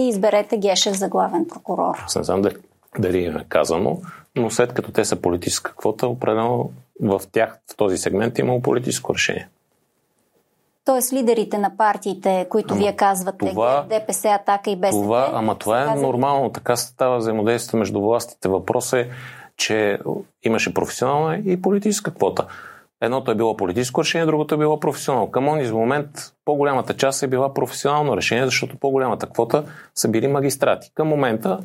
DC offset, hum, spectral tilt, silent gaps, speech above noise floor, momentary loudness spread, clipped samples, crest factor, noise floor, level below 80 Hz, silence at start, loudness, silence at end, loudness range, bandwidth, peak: under 0.1%; none; -4.5 dB/octave; none; 46 dB; 5 LU; under 0.1%; 20 dB; -67 dBFS; -58 dBFS; 0 s; -20 LUFS; 0 s; 2 LU; 16.5 kHz; 0 dBFS